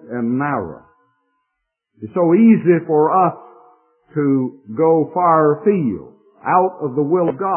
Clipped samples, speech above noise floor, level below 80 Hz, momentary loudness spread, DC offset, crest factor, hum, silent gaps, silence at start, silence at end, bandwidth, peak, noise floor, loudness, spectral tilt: under 0.1%; 60 dB; -62 dBFS; 13 LU; under 0.1%; 16 dB; none; none; 0.05 s; 0 s; 3.1 kHz; -2 dBFS; -76 dBFS; -16 LUFS; -14 dB/octave